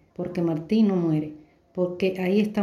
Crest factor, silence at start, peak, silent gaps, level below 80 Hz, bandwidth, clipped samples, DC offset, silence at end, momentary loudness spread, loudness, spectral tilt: 14 dB; 0.2 s; -10 dBFS; none; -62 dBFS; 12.5 kHz; under 0.1%; under 0.1%; 0 s; 10 LU; -25 LUFS; -8.5 dB/octave